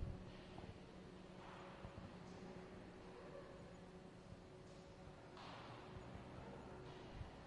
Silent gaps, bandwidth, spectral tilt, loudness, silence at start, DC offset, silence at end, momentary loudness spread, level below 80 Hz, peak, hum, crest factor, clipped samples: none; 11 kHz; -6.5 dB/octave; -57 LUFS; 0 s; under 0.1%; 0 s; 4 LU; -64 dBFS; -36 dBFS; none; 20 dB; under 0.1%